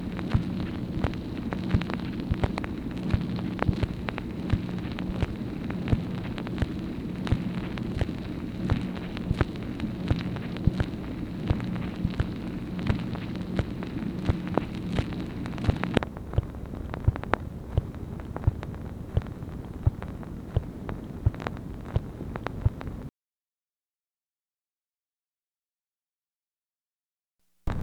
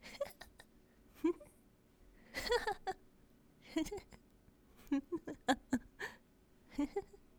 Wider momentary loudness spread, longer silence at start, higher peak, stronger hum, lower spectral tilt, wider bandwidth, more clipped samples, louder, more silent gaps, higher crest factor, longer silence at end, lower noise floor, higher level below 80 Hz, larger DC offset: second, 8 LU vs 21 LU; about the same, 0 s vs 0.05 s; first, 0 dBFS vs -20 dBFS; neither; first, -8 dB/octave vs -4 dB/octave; second, 14.5 kHz vs over 20 kHz; neither; first, -31 LUFS vs -42 LUFS; first, 26.35-26.40 s, 26.47-26.51 s vs none; first, 30 dB vs 24 dB; second, 0 s vs 0.2 s; first, under -90 dBFS vs -68 dBFS; first, -38 dBFS vs -62 dBFS; neither